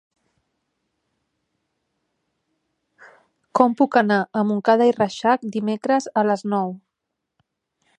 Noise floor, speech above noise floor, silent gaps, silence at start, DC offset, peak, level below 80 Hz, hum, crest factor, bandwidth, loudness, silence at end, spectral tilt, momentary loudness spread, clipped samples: -81 dBFS; 61 dB; none; 3.55 s; under 0.1%; 0 dBFS; -72 dBFS; none; 22 dB; 9.4 kHz; -20 LUFS; 1.2 s; -6 dB/octave; 8 LU; under 0.1%